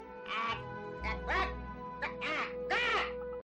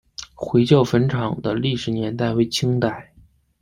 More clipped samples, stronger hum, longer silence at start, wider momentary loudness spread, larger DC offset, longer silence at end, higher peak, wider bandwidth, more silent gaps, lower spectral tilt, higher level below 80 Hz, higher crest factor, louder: neither; neither; second, 0 s vs 0.2 s; about the same, 9 LU vs 10 LU; neither; second, 0 s vs 0.6 s; second, -22 dBFS vs -2 dBFS; second, 9.6 kHz vs 15.5 kHz; neither; second, -4.5 dB/octave vs -6.5 dB/octave; about the same, -48 dBFS vs -50 dBFS; about the same, 16 dB vs 18 dB; second, -35 LUFS vs -20 LUFS